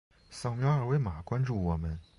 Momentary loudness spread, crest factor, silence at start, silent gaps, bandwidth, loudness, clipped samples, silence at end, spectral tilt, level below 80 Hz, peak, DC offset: 9 LU; 12 dB; 0.3 s; none; 11.5 kHz; -32 LUFS; under 0.1%; 0.15 s; -8 dB/octave; -44 dBFS; -18 dBFS; under 0.1%